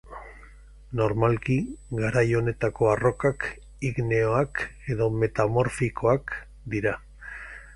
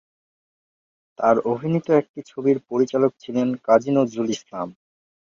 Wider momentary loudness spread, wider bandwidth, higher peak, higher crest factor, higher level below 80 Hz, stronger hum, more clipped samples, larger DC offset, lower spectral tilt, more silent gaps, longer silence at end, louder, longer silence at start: first, 14 LU vs 11 LU; first, 11.5 kHz vs 7.4 kHz; about the same, -6 dBFS vs -4 dBFS; about the same, 20 dB vs 20 dB; first, -46 dBFS vs -64 dBFS; neither; neither; neither; about the same, -7.5 dB/octave vs -7 dB/octave; second, none vs 2.09-2.14 s; second, 0 s vs 0.65 s; second, -26 LUFS vs -21 LUFS; second, 0.05 s vs 1.2 s